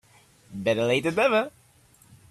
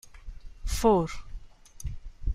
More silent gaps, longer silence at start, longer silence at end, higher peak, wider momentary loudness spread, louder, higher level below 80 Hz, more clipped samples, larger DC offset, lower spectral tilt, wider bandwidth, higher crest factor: neither; first, 0.5 s vs 0.05 s; first, 0.8 s vs 0 s; about the same, -10 dBFS vs -10 dBFS; second, 13 LU vs 26 LU; first, -24 LUFS vs -27 LUFS; second, -64 dBFS vs -36 dBFS; neither; neither; about the same, -5 dB/octave vs -6 dB/octave; second, 14 kHz vs 16 kHz; about the same, 18 dB vs 20 dB